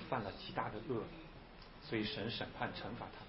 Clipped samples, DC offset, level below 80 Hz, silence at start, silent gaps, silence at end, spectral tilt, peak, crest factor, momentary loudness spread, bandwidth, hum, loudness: under 0.1%; under 0.1%; -62 dBFS; 0 s; none; 0 s; -3.5 dB/octave; -24 dBFS; 20 dB; 14 LU; 5.6 kHz; none; -43 LUFS